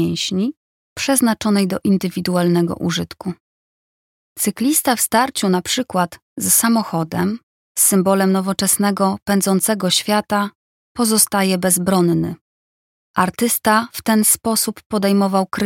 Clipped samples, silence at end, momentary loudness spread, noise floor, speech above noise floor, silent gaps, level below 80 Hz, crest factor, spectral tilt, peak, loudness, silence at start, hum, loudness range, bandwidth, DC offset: under 0.1%; 0 s; 10 LU; under -90 dBFS; over 73 dB; 0.57-0.96 s, 3.40-4.36 s, 6.22-6.36 s, 7.43-7.75 s, 10.55-10.95 s, 12.41-13.14 s, 14.86-14.90 s; -54 dBFS; 18 dB; -4 dB/octave; 0 dBFS; -17 LUFS; 0 s; none; 3 LU; 17 kHz; under 0.1%